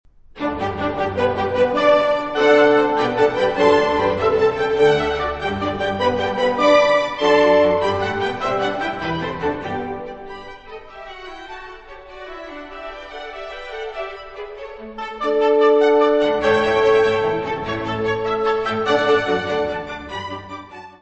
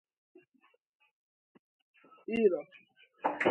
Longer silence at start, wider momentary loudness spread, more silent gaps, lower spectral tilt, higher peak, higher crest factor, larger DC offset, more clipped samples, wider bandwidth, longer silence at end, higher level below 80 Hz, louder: second, 0.35 s vs 2.3 s; about the same, 20 LU vs 20 LU; neither; about the same, -5.5 dB/octave vs -6.5 dB/octave; first, -2 dBFS vs -12 dBFS; second, 18 dB vs 24 dB; first, 0.1% vs under 0.1%; neither; about the same, 8.4 kHz vs 8.6 kHz; about the same, 0.1 s vs 0 s; first, -46 dBFS vs -76 dBFS; first, -18 LUFS vs -32 LUFS